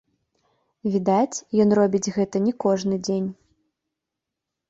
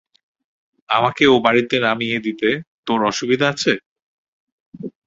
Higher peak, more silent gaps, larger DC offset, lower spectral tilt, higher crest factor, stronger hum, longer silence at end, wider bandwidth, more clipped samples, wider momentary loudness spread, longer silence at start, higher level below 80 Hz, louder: second, -8 dBFS vs 0 dBFS; second, none vs 2.67-2.83 s, 3.86-3.96 s, 4.02-4.72 s; neither; first, -6 dB/octave vs -4.5 dB/octave; about the same, 16 dB vs 20 dB; neither; first, 1.35 s vs 0.15 s; about the same, 8 kHz vs 8 kHz; neither; about the same, 8 LU vs 10 LU; about the same, 0.85 s vs 0.9 s; second, -64 dBFS vs -58 dBFS; second, -22 LUFS vs -18 LUFS